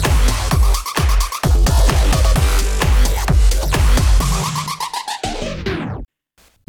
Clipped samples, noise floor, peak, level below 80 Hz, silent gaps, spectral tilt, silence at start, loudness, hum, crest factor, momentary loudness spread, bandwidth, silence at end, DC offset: under 0.1%; -56 dBFS; -4 dBFS; -16 dBFS; none; -4.5 dB/octave; 0 s; -17 LUFS; none; 12 dB; 8 LU; 18.5 kHz; 0.65 s; under 0.1%